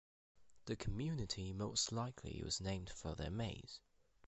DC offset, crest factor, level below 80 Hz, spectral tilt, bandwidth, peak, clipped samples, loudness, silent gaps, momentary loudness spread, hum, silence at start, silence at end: under 0.1%; 22 dB; -56 dBFS; -4 dB/octave; 8.2 kHz; -24 dBFS; under 0.1%; -44 LUFS; none; 12 LU; none; 0.35 s; 0.5 s